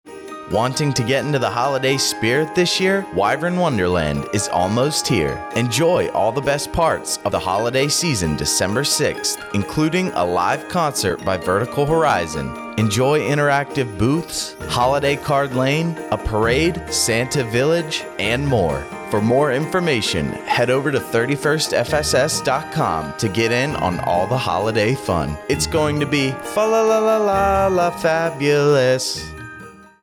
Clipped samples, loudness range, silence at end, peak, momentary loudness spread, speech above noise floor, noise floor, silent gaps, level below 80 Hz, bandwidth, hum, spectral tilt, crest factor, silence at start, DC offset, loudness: under 0.1%; 2 LU; 0.2 s; -6 dBFS; 6 LU; 21 dB; -40 dBFS; none; -42 dBFS; 18 kHz; none; -4.5 dB/octave; 14 dB; 0.05 s; under 0.1%; -19 LUFS